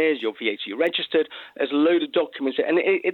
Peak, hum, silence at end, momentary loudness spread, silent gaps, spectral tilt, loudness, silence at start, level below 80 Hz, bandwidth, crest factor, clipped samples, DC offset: -8 dBFS; none; 0 s; 7 LU; none; -6 dB/octave; -23 LUFS; 0 s; -76 dBFS; 4.4 kHz; 14 dB; under 0.1%; under 0.1%